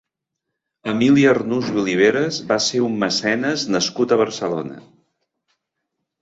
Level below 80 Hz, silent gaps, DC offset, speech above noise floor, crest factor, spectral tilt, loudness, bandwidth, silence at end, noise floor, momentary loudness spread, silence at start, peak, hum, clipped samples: -60 dBFS; none; under 0.1%; 62 dB; 18 dB; -4.5 dB/octave; -18 LUFS; 8 kHz; 1.4 s; -80 dBFS; 10 LU; 0.85 s; -2 dBFS; none; under 0.1%